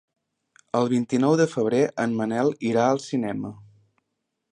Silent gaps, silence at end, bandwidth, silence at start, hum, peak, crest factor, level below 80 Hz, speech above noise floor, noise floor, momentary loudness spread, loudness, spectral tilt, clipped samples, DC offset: none; 0.9 s; 10.5 kHz; 0.75 s; none; -8 dBFS; 18 dB; -68 dBFS; 57 dB; -79 dBFS; 8 LU; -23 LUFS; -6.5 dB/octave; under 0.1%; under 0.1%